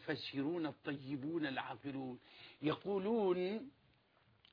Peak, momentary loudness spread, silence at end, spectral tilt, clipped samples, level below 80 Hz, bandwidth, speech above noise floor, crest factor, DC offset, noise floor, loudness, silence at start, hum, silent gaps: -24 dBFS; 12 LU; 0.8 s; -4.5 dB/octave; under 0.1%; -80 dBFS; 5.4 kHz; 32 dB; 16 dB; under 0.1%; -73 dBFS; -41 LUFS; 0 s; none; none